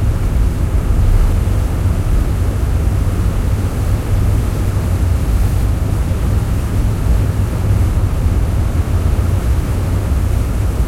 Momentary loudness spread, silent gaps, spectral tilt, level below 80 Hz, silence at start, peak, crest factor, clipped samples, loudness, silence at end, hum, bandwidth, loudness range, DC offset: 2 LU; none; -7 dB/octave; -16 dBFS; 0 s; -2 dBFS; 12 dB; under 0.1%; -17 LUFS; 0 s; none; 16 kHz; 1 LU; under 0.1%